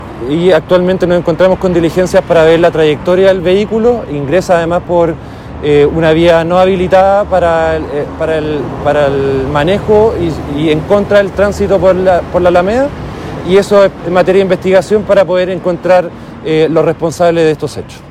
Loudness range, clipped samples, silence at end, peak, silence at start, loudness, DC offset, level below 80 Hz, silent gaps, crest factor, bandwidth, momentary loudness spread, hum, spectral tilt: 2 LU; 2%; 0 s; 0 dBFS; 0 s; -10 LUFS; under 0.1%; -32 dBFS; none; 10 dB; 14 kHz; 8 LU; none; -6.5 dB/octave